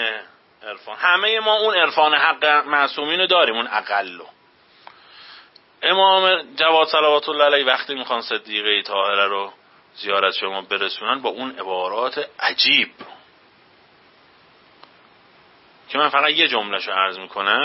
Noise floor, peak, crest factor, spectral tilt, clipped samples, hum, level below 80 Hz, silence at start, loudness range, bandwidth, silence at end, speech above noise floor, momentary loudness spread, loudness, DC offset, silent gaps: -54 dBFS; -2 dBFS; 18 dB; -5 dB/octave; under 0.1%; none; -74 dBFS; 0 s; 6 LU; 6 kHz; 0 s; 35 dB; 11 LU; -18 LUFS; under 0.1%; none